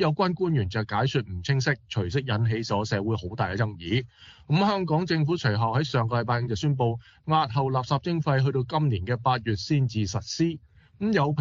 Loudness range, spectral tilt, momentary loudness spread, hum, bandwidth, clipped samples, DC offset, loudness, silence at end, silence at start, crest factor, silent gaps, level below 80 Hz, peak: 2 LU; -5.5 dB/octave; 5 LU; none; 7.6 kHz; under 0.1%; under 0.1%; -26 LUFS; 0 s; 0 s; 18 dB; none; -54 dBFS; -8 dBFS